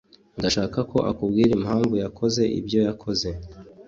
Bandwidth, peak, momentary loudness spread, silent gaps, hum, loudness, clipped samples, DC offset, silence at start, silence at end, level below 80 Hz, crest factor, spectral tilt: 7.8 kHz; -6 dBFS; 10 LU; none; none; -23 LUFS; under 0.1%; under 0.1%; 0.35 s; 0.05 s; -46 dBFS; 16 dB; -5.5 dB/octave